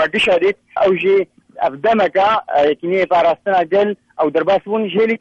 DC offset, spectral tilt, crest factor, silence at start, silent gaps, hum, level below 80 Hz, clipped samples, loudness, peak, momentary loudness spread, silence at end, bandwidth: under 0.1%; -6 dB/octave; 10 dB; 0 s; none; none; -56 dBFS; under 0.1%; -16 LUFS; -6 dBFS; 5 LU; 0.05 s; 9.2 kHz